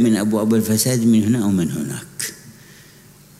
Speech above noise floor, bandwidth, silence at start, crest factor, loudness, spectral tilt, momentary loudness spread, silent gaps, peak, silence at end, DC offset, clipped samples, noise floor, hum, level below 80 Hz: 29 dB; 16 kHz; 0 s; 14 dB; -18 LUFS; -5.5 dB/octave; 12 LU; none; -6 dBFS; 0.9 s; under 0.1%; under 0.1%; -46 dBFS; none; -56 dBFS